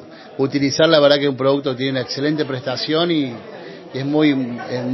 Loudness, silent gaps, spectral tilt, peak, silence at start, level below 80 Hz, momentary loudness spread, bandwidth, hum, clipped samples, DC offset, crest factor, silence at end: -18 LUFS; none; -5.5 dB/octave; 0 dBFS; 0 s; -62 dBFS; 15 LU; 6.2 kHz; none; under 0.1%; under 0.1%; 18 dB; 0 s